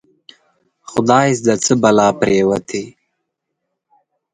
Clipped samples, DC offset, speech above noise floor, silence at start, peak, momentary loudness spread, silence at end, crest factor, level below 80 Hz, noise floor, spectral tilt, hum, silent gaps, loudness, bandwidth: under 0.1%; under 0.1%; 62 dB; 0.9 s; 0 dBFS; 13 LU; 1.45 s; 18 dB; -54 dBFS; -75 dBFS; -5 dB/octave; none; none; -15 LUFS; 11 kHz